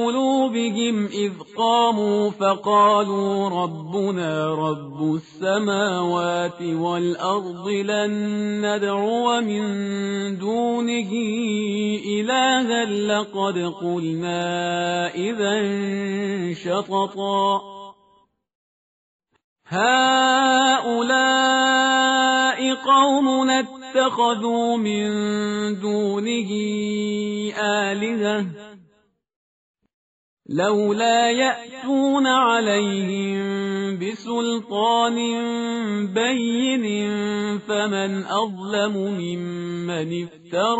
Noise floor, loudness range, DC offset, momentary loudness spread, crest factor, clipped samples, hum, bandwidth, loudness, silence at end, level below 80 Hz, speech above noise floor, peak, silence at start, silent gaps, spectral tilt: -63 dBFS; 7 LU; under 0.1%; 9 LU; 16 dB; under 0.1%; none; 8 kHz; -21 LUFS; 0 s; -68 dBFS; 42 dB; -6 dBFS; 0 s; 18.55-19.19 s, 19.44-19.56 s, 29.36-29.74 s, 29.94-30.37 s; -3 dB/octave